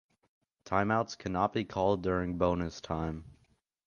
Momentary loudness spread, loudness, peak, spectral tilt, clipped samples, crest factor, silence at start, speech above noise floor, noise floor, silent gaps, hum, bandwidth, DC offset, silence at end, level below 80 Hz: 7 LU; -32 LUFS; -12 dBFS; -6.5 dB/octave; under 0.1%; 20 dB; 0.65 s; 39 dB; -71 dBFS; none; none; 7.2 kHz; under 0.1%; 0.55 s; -50 dBFS